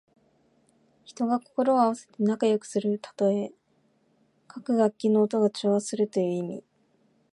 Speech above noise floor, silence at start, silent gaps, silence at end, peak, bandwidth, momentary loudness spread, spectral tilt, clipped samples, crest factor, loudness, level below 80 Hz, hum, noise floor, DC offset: 42 dB; 1.1 s; none; 0.75 s; -10 dBFS; 11.5 kHz; 10 LU; -6.5 dB/octave; under 0.1%; 18 dB; -26 LUFS; -80 dBFS; none; -68 dBFS; under 0.1%